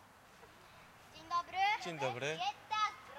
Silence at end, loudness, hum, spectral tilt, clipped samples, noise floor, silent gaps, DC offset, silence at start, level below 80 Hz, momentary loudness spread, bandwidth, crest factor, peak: 0 s; -37 LUFS; none; -3 dB/octave; under 0.1%; -60 dBFS; none; under 0.1%; 0 s; -74 dBFS; 24 LU; 16 kHz; 18 dB; -22 dBFS